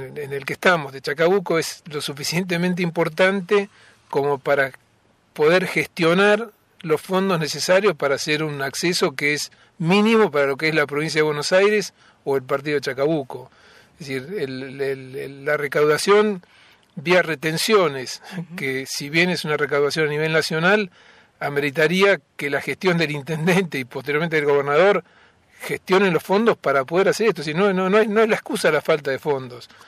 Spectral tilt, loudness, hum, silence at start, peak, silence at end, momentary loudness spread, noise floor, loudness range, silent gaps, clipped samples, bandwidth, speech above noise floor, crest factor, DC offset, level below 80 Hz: -4.5 dB/octave; -20 LUFS; none; 0 s; -2 dBFS; 0.25 s; 12 LU; -60 dBFS; 3 LU; none; under 0.1%; 15.5 kHz; 39 dB; 18 dB; under 0.1%; -66 dBFS